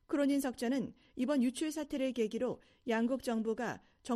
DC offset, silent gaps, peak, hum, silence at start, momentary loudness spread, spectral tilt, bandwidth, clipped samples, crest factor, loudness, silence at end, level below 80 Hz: under 0.1%; none; -20 dBFS; none; 0.1 s; 7 LU; -5 dB/octave; 14 kHz; under 0.1%; 14 dB; -36 LUFS; 0 s; -68 dBFS